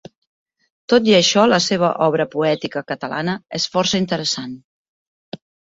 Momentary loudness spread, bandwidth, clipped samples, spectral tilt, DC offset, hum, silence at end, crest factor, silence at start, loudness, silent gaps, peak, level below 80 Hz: 23 LU; 8 kHz; under 0.1%; -4 dB/octave; under 0.1%; none; 0.4 s; 18 dB; 0.9 s; -18 LUFS; 4.64-5.32 s; -2 dBFS; -58 dBFS